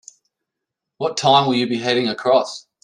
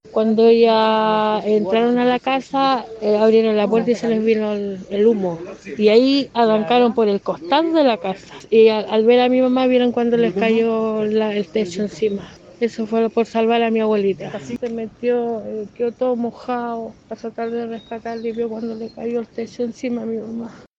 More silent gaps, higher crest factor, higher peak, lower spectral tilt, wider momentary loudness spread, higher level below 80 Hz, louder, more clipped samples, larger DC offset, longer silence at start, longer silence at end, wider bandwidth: neither; about the same, 18 dB vs 16 dB; about the same, -2 dBFS vs -2 dBFS; second, -4.5 dB/octave vs -6 dB/octave; second, 10 LU vs 13 LU; second, -66 dBFS vs -60 dBFS; about the same, -18 LUFS vs -18 LUFS; neither; neither; first, 1 s vs 0.05 s; about the same, 0.25 s vs 0.2 s; first, 10.5 kHz vs 7.6 kHz